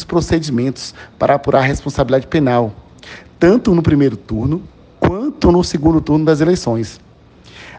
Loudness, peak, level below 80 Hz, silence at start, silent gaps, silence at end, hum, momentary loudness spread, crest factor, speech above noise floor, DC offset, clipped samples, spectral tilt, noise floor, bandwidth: -15 LUFS; 0 dBFS; -34 dBFS; 0 s; none; 0 s; none; 11 LU; 16 dB; 29 dB; under 0.1%; under 0.1%; -7 dB/octave; -43 dBFS; 9.4 kHz